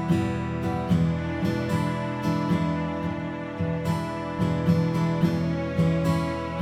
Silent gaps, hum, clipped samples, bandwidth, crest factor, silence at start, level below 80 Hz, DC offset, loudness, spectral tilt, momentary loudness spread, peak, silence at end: none; none; under 0.1%; 13 kHz; 16 dB; 0 s; -44 dBFS; under 0.1%; -26 LUFS; -8 dB/octave; 6 LU; -10 dBFS; 0 s